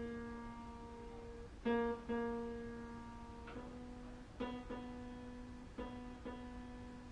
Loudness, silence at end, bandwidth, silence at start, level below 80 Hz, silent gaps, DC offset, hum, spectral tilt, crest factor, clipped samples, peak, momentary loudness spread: -47 LUFS; 0 s; 11 kHz; 0 s; -58 dBFS; none; under 0.1%; none; -6.5 dB/octave; 18 dB; under 0.1%; -28 dBFS; 13 LU